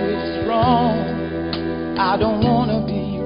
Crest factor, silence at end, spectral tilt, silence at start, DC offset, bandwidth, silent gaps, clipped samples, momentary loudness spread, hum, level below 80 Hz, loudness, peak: 16 dB; 0 s; -12 dB/octave; 0 s; under 0.1%; 5.4 kHz; none; under 0.1%; 7 LU; none; -36 dBFS; -19 LUFS; -2 dBFS